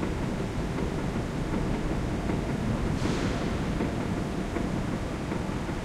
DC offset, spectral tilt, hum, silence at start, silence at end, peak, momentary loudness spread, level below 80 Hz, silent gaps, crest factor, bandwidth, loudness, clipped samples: under 0.1%; -6.5 dB/octave; none; 0 s; 0 s; -16 dBFS; 3 LU; -36 dBFS; none; 14 dB; 15 kHz; -30 LUFS; under 0.1%